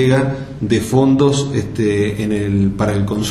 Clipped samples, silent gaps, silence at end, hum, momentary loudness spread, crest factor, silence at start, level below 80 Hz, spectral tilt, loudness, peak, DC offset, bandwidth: under 0.1%; none; 0 s; none; 6 LU; 14 dB; 0 s; -38 dBFS; -6.5 dB/octave; -16 LUFS; 0 dBFS; under 0.1%; 13.5 kHz